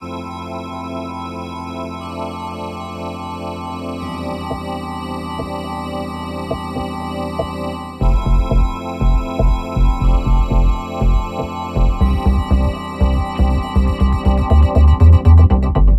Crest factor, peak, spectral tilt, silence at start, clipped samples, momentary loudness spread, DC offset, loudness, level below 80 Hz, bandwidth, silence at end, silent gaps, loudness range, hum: 14 dB; 0 dBFS; -8 dB/octave; 0 s; under 0.1%; 15 LU; under 0.1%; -18 LUFS; -18 dBFS; 9.4 kHz; 0 s; none; 12 LU; none